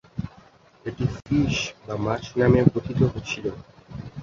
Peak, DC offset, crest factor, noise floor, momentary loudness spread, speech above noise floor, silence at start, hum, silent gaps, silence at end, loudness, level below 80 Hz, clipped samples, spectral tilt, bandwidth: -2 dBFS; under 0.1%; 22 dB; -53 dBFS; 20 LU; 30 dB; 0.15 s; none; none; 0 s; -24 LUFS; -44 dBFS; under 0.1%; -6.5 dB/octave; 7.6 kHz